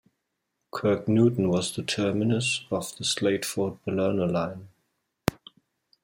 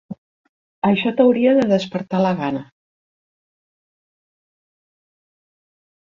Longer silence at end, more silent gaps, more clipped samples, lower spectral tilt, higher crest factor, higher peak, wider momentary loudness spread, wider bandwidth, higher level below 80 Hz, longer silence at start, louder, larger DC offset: second, 0.75 s vs 3.4 s; second, none vs 0.18-0.82 s; neither; second, -5 dB/octave vs -7.5 dB/octave; first, 26 dB vs 20 dB; about the same, -2 dBFS vs -2 dBFS; second, 9 LU vs 14 LU; first, 16.5 kHz vs 7.4 kHz; about the same, -60 dBFS vs -62 dBFS; first, 0.75 s vs 0.1 s; second, -26 LUFS vs -18 LUFS; neither